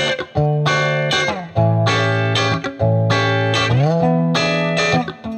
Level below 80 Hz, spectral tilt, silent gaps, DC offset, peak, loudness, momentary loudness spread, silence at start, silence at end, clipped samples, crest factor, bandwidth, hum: -48 dBFS; -5.5 dB/octave; none; under 0.1%; -2 dBFS; -17 LUFS; 4 LU; 0 s; 0 s; under 0.1%; 14 dB; 8.8 kHz; none